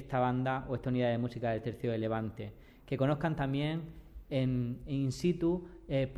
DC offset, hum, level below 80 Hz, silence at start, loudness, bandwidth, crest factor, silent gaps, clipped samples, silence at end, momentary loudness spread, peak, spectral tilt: under 0.1%; none; -54 dBFS; 0 s; -34 LUFS; 12.5 kHz; 16 dB; none; under 0.1%; 0 s; 9 LU; -18 dBFS; -7.5 dB/octave